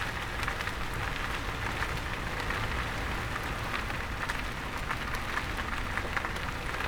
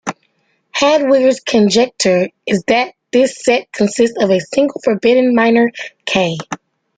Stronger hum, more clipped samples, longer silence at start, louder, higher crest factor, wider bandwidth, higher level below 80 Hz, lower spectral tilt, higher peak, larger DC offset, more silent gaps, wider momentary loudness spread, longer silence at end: neither; neither; about the same, 0 s vs 0.05 s; second, -33 LUFS vs -14 LUFS; first, 20 dB vs 12 dB; first, over 20 kHz vs 9.6 kHz; first, -40 dBFS vs -56 dBFS; about the same, -4 dB/octave vs -4.5 dB/octave; second, -14 dBFS vs -2 dBFS; neither; neither; second, 2 LU vs 8 LU; second, 0 s vs 0.4 s